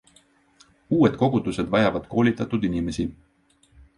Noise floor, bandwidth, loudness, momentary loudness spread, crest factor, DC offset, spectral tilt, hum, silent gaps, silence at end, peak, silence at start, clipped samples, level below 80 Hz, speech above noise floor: -61 dBFS; 11 kHz; -23 LUFS; 8 LU; 18 dB; under 0.1%; -7 dB/octave; none; none; 0.85 s; -6 dBFS; 0.9 s; under 0.1%; -48 dBFS; 39 dB